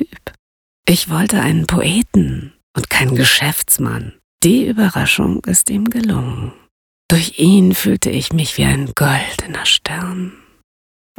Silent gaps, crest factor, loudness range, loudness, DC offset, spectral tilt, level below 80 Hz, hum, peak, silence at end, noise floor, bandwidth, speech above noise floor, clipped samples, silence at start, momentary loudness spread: 0.39-0.83 s, 2.63-2.74 s, 4.24-4.39 s, 6.71-7.09 s; 16 dB; 2 LU; -14 LUFS; under 0.1%; -4 dB/octave; -38 dBFS; none; 0 dBFS; 0.9 s; under -90 dBFS; over 20 kHz; over 75 dB; under 0.1%; 0 s; 14 LU